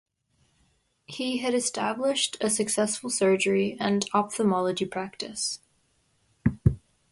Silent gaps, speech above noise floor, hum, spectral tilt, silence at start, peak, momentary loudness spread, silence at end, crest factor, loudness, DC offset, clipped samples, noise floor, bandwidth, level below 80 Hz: none; 43 dB; none; -4 dB/octave; 1.1 s; -6 dBFS; 9 LU; 0.35 s; 20 dB; -26 LUFS; under 0.1%; under 0.1%; -69 dBFS; 11.5 kHz; -48 dBFS